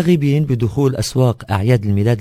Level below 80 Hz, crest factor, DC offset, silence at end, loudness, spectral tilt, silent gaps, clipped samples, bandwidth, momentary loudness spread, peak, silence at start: -36 dBFS; 14 dB; under 0.1%; 0 s; -16 LUFS; -7 dB/octave; none; under 0.1%; 16 kHz; 3 LU; 0 dBFS; 0 s